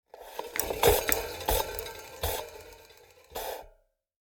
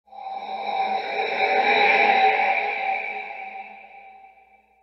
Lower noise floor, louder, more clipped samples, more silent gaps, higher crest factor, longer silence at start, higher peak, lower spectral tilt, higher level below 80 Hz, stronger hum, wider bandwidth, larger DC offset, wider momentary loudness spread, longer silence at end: first, -64 dBFS vs -56 dBFS; second, -30 LUFS vs -21 LUFS; neither; neither; first, 28 dB vs 16 dB; about the same, 0.15 s vs 0.1 s; about the same, -6 dBFS vs -6 dBFS; about the same, -2.5 dB/octave vs -3 dB/octave; first, -44 dBFS vs -78 dBFS; neither; first, over 20 kHz vs 6.2 kHz; neither; about the same, 19 LU vs 19 LU; about the same, 0.5 s vs 0.55 s